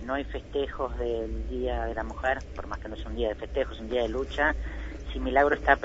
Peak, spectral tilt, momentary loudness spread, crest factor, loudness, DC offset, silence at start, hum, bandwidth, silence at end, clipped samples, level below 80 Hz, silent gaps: -6 dBFS; -6.5 dB/octave; 13 LU; 24 dB; -30 LUFS; under 0.1%; 0 s; none; 7.8 kHz; 0 s; under 0.1%; -38 dBFS; none